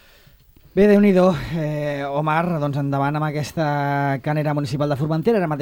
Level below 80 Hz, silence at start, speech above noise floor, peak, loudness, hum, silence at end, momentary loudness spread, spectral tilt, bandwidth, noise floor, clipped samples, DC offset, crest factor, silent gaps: -48 dBFS; 0.75 s; 32 dB; -4 dBFS; -20 LUFS; none; 0 s; 9 LU; -8 dB/octave; 16.5 kHz; -51 dBFS; under 0.1%; under 0.1%; 16 dB; none